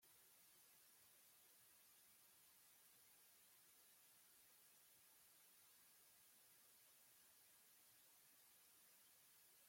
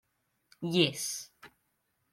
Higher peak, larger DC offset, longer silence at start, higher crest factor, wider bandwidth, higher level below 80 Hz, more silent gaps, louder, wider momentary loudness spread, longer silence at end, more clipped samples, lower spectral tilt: second, -58 dBFS vs -12 dBFS; neither; second, 0 s vs 0.6 s; second, 14 dB vs 24 dB; about the same, 16.5 kHz vs 16 kHz; second, under -90 dBFS vs -78 dBFS; neither; second, -69 LUFS vs -31 LUFS; second, 0 LU vs 14 LU; second, 0 s vs 0.65 s; neither; second, 0 dB/octave vs -3.5 dB/octave